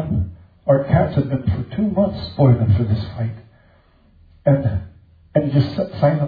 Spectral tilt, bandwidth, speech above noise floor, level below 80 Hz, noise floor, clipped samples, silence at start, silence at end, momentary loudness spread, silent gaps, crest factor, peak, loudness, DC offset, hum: -11 dB/octave; 5 kHz; 36 dB; -40 dBFS; -53 dBFS; under 0.1%; 0 s; 0 s; 11 LU; none; 16 dB; -4 dBFS; -19 LUFS; under 0.1%; none